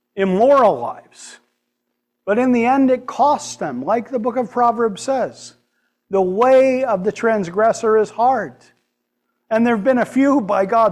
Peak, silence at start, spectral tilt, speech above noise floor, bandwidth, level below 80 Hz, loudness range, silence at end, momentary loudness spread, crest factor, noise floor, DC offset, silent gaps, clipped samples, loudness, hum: -4 dBFS; 0.15 s; -6 dB/octave; 58 dB; 11.5 kHz; -62 dBFS; 3 LU; 0 s; 9 LU; 14 dB; -74 dBFS; under 0.1%; none; under 0.1%; -17 LUFS; none